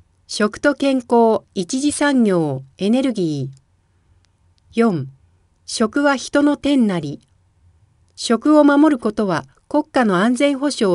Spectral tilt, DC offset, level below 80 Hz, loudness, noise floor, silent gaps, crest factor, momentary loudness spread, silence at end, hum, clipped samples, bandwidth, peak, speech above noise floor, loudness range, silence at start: -5 dB/octave; under 0.1%; -56 dBFS; -17 LUFS; -59 dBFS; none; 16 dB; 12 LU; 0 s; none; under 0.1%; 11.5 kHz; -2 dBFS; 42 dB; 5 LU; 0.3 s